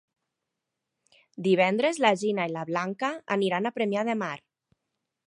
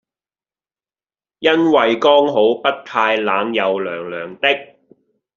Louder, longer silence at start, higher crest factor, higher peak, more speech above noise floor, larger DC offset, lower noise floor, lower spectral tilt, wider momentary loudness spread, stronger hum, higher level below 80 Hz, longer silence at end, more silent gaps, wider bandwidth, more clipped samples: second, -27 LUFS vs -16 LUFS; about the same, 1.4 s vs 1.4 s; about the same, 20 dB vs 18 dB; second, -8 dBFS vs 0 dBFS; second, 58 dB vs over 74 dB; neither; second, -85 dBFS vs under -90 dBFS; first, -5 dB/octave vs -1.5 dB/octave; about the same, 8 LU vs 9 LU; neither; second, -80 dBFS vs -66 dBFS; first, 0.9 s vs 0.7 s; neither; first, 11.5 kHz vs 7.2 kHz; neither